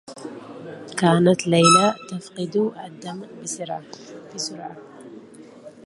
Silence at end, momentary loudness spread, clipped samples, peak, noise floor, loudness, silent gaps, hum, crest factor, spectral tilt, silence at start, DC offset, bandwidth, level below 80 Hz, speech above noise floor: 0.15 s; 24 LU; under 0.1%; -2 dBFS; -43 dBFS; -20 LUFS; none; none; 22 dB; -4.5 dB/octave; 0.1 s; under 0.1%; 11.5 kHz; -66 dBFS; 22 dB